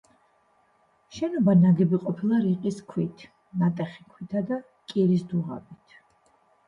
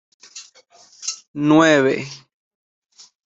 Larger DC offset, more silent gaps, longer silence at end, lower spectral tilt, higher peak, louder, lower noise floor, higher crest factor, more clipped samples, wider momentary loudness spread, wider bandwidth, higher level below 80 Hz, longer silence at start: neither; second, none vs 1.28-1.34 s; second, 0.95 s vs 1.1 s; first, -9 dB/octave vs -4.5 dB/octave; second, -10 dBFS vs -2 dBFS; second, -25 LUFS vs -17 LUFS; first, -65 dBFS vs -51 dBFS; about the same, 16 dB vs 20 dB; neither; second, 16 LU vs 26 LU; about the same, 7.4 kHz vs 8 kHz; about the same, -66 dBFS vs -62 dBFS; first, 1.1 s vs 0.35 s